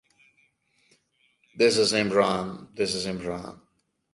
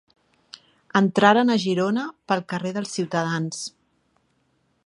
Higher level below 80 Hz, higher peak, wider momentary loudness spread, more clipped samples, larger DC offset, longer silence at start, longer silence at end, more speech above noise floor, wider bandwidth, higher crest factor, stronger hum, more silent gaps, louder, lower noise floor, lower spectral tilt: first, -60 dBFS vs -72 dBFS; second, -6 dBFS vs -2 dBFS; first, 15 LU vs 11 LU; neither; neither; first, 1.55 s vs 0.95 s; second, 0.6 s vs 1.2 s; about the same, 46 dB vs 46 dB; about the same, 11.5 kHz vs 11 kHz; about the same, 22 dB vs 22 dB; neither; neither; second, -25 LUFS vs -22 LUFS; about the same, -71 dBFS vs -68 dBFS; second, -3.5 dB/octave vs -5 dB/octave